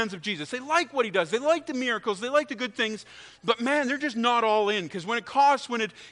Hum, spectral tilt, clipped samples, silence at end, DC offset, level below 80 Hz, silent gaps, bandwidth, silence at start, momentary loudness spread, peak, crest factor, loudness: none; -3.5 dB/octave; under 0.1%; 0 s; under 0.1%; -72 dBFS; none; 10.5 kHz; 0 s; 9 LU; -8 dBFS; 20 dB; -26 LUFS